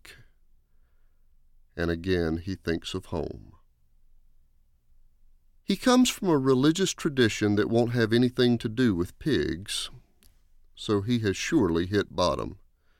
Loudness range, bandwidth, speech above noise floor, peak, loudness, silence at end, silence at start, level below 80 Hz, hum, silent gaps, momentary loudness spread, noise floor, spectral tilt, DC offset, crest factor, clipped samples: 9 LU; 16.5 kHz; 36 dB; -8 dBFS; -26 LUFS; 0.45 s; 0.05 s; -50 dBFS; none; none; 11 LU; -61 dBFS; -5 dB/octave; under 0.1%; 18 dB; under 0.1%